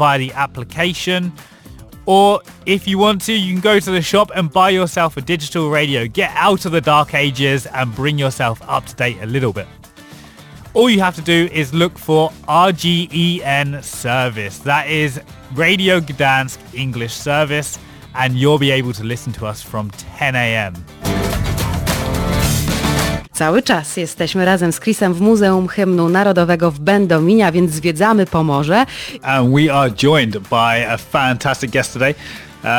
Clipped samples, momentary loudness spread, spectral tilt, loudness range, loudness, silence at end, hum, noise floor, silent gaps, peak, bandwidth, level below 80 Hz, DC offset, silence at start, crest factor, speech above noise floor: under 0.1%; 10 LU; -5 dB/octave; 4 LU; -15 LUFS; 0 s; none; -39 dBFS; none; -2 dBFS; 19 kHz; -36 dBFS; under 0.1%; 0 s; 14 dB; 24 dB